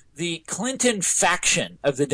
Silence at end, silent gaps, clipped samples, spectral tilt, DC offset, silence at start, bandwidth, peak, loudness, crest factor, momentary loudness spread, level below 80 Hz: 0 s; none; under 0.1%; -2 dB/octave; under 0.1%; 0.15 s; 11 kHz; -8 dBFS; -21 LUFS; 16 dB; 10 LU; -54 dBFS